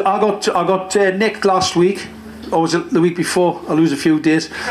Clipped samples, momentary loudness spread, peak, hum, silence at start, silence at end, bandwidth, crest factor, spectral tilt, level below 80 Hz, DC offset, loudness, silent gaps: under 0.1%; 4 LU; -2 dBFS; none; 0 s; 0 s; 14 kHz; 14 dB; -5 dB/octave; -52 dBFS; under 0.1%; -16 LUFS; none